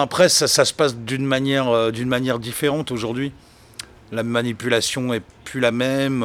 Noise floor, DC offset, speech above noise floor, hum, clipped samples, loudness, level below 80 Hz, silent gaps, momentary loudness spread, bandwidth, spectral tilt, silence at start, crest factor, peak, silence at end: -40 dBFS; under 0.1%; 20 dB; none; under 0.1%; -20 LUFS; -54 dBFS; none; 15 LU; 18.5 kHz; -3.5 dB/octave; 0 s; 20 dB; -2 dBFS; 0 s